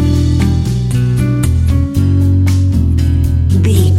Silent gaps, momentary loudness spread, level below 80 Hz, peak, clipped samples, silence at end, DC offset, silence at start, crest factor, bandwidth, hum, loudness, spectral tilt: none; 2 LU; -18 dBFS; 0 dBFS; under 0.1%; 0 s; under 0.1%; 0 s; 10 dB; 14 kHz; none; -12 LUFS; -7.5 dB/octave